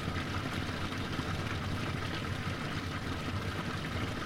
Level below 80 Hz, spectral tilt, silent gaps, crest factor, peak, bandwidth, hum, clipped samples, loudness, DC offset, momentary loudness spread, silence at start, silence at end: -48 dBFS; -5.5 dB/octave; none; 14 dB; -20 dBFS; 16.5 kHz; none; under 0.1%; -36 LUFS; under 0.1%; 1 LU; 0 s; 0 s